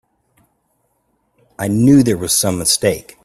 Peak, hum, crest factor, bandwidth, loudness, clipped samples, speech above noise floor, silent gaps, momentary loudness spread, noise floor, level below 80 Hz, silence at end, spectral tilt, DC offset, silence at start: 0 dBFS; none; 16 dB; 15 kHz; -14 LUFS; under 0.1%; 51 dB; none; 9 LU; -65 dBFS; -48 dBFS; 0.25 s; -4.5 dB/octave; under 0.1%; 1.6 s